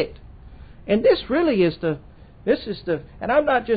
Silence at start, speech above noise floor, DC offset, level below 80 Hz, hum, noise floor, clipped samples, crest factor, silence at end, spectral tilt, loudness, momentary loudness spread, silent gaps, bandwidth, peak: 0 s; 22 dB; under 0.1%; -46 dBFS; none; -42 dBFS; under 0.1%; 16 dB; 0 s; -11 dB/octave; -22 LUFS; 11 LU; none; 5 kHz; -6 dBFS